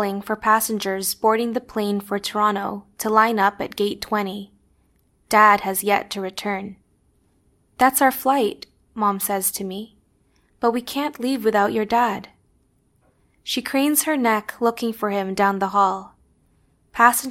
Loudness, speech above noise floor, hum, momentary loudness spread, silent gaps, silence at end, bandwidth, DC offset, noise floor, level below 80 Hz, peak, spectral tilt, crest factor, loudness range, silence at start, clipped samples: -21 LUFS; 42 dB; none; 13 LU; none; 0 s; 16.5 kHz; under 0.1%; -63 dBFS; -58 dBFS; 0 dBFS; -3.5 dB/octave; 22 dB; 3 LU; 0 s; under 0.1%